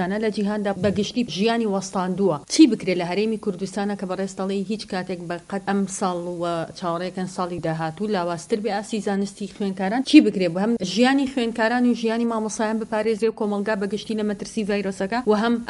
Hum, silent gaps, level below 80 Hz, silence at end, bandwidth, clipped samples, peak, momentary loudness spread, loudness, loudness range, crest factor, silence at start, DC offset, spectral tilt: none; none; -58 dBFS; 0 s; 11.5 kHz; under 0.1%; 0 dBFS; 10 LU; -23 LUFS; 6 LU; 22 dB; 0 s; under 0.1%; -5 dB/octave